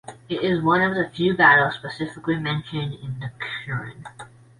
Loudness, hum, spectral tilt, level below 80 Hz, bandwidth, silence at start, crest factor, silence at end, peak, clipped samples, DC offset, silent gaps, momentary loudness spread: -22 LUFS; none; -6.5 dB/octave; -56 dBFS; 11.5 kHz; 0.1 s; 20 dB; 0.3 s; -2 dBFS; under 0.1%; under 0.1%; none; 17 LU